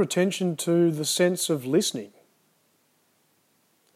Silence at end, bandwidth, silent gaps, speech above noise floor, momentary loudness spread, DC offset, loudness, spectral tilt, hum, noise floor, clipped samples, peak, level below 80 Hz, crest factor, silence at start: 1.9 s; 15 kHz; none; 43 dB; 7 LU; under 0.1%; -24 LUFS; -4.5 dB/octave; none; -67 dBFS; under 0.1%; -10 dBFS; -86 dBFS; 18 dB; 0 s